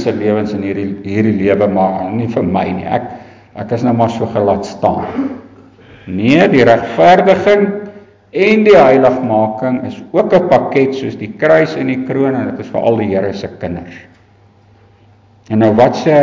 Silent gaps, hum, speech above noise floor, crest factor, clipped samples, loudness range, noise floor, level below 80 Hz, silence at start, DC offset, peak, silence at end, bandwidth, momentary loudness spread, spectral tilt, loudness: none; none; 35 dB; 12 dB; under 0.1%; 7 LU; -46 dBFS; -44 dBFS; 0 s; under 0.1%; 0 dBFS; 0 s; 7.6 kHz; 14 LU; -7.5 dB/octave; -13 LUFS